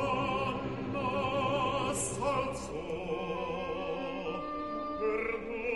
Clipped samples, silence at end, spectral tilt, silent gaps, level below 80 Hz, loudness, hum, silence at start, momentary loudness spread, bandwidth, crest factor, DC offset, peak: under 0.1%; 0 s; -4.5 dB/octave; none; -54 dBFS; -34 LUFS; none; 0 s; 6 LU; 11.5 kHz; 16 dB; 0.2%; -18 dBFS